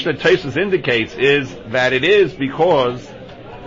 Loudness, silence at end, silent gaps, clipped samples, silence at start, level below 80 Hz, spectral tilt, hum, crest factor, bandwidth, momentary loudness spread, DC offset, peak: -16 LUFS; 0 s; none; under 0.1%; 0 s; -46 dBFS; -5.5 dB/octave; none; 14 dB; 7.6 kHz; 16 LU; under 0.1%; -4 dBFS